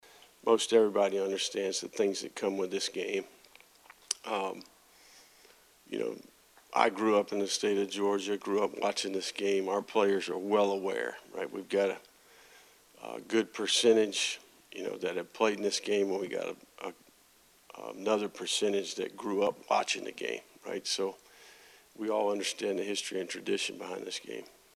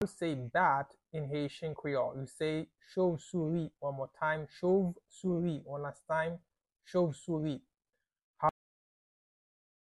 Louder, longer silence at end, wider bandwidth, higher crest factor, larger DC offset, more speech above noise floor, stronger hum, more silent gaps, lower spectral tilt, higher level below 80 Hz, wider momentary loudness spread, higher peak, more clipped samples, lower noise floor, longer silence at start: first, -32 LUFS vs -35 LUFS; second, 0.3 s vs 1.3 s; first, 14 kHz vs 12 kHz; about the same, 24 dB vs 20 dB; neither; second, 32 dB vs 54 dB; neither; second, none vs 8.23-8.34 s; second, -2.5 dB/octave vs -7 dB/octave; second, -80 dBFS vs -70 dBFS; first, 13 LU vs 9 LU; first, -10 dBFS vs -16 dBFS; neither; second, -63 dBFS vs -89 dBFS; first, 0.45 s vs 0 s